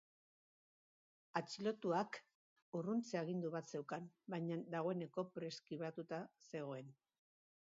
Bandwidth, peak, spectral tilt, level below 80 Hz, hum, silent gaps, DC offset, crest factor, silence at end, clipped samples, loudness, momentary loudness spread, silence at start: 7.4 kHz; -26 dBFS; -5.5 dB/octave; under -90 dBFS; none; 2.35-2.56 s, 2.62-2.72 s; under 0.1%; 20 dB; 0.8 s; under 0.1%; -45 LUFS; 8 LU; 1.35 s